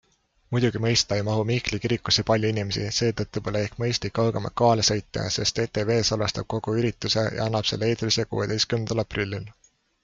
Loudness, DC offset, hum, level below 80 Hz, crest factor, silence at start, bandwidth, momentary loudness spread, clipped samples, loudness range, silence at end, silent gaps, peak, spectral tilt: -24 LUFS; under 0.1%; none; -50 dBFS; 18 dB; 0.5 s; 7.6 kHz; 6 LU; under 0.1%; 1 LU; 0.55 s; none; -6 dBFS; -4.5 dB/octave